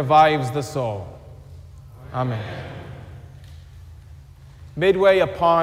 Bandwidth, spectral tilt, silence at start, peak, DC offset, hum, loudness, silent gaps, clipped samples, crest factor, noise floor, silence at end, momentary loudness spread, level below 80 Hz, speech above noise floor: 16 kHz; -6.5 dB/octave; 0 s; -4 dBFS; under 0.1%; none; -20 LUFS; none; under 0.1%; 18 dB; -43 dBFS; 0 s; 27 LU; -48 dBFS; 25 dB